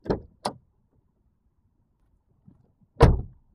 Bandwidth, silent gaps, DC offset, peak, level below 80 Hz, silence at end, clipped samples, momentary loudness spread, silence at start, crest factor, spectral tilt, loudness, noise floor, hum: 12.5 kHz; none; under 0.1%; 0 dBFS; -34 dBFS; 0.3 s; under 0.1%; 15 LU; 0.05 s; 28 dB; -7.5 dB/octave; -25 LUFS; -68 dBFS; none